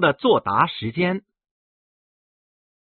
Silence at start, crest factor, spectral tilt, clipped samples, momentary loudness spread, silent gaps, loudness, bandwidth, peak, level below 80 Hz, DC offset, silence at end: 0 s; 20 dB; -3.5 dB/octave; under 0.1%; 6 LU; none; -21 LUFS; 4.5 kHz; -4 dBFS; -60 dBFS; under 0.1%; 1.75 s